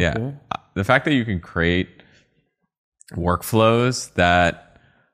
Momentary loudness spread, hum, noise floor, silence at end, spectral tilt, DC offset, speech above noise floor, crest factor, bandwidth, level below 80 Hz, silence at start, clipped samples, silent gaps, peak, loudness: 14 LU; none; -68 dBFS; 0.55 s; -5.5 dB/octave; under 0.1%; 49 dB; 20 dB; 15 kHz; -42 dBFS; 0 s; under 0.1%; 2.78-2.92 s; -2 dBFS; -20 LUFS